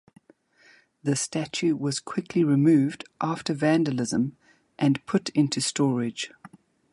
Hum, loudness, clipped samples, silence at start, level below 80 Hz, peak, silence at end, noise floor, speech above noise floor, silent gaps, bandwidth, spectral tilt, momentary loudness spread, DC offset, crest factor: none; -25 LUFS; under 0.1%; 1.05 s; -68 dBFS; -10 dBFS; 0.45 s; -59 dBFS; 35 dB; none; 11.5 kHz; -5 dB/octave; 10 LU; under 0.1%; 16 dB